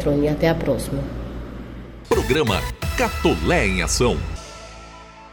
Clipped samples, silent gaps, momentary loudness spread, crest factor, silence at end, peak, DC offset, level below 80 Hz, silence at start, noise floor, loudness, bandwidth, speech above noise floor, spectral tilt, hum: under 0.1%; none; 19 LU; 16 dB; 0 s; -6 dBFS; under 0.1%; -30 dBFS; 0 s; -41 dBFS; -21 LUFS; 17.5 kHz; 21 dB; -5 dB/octave; none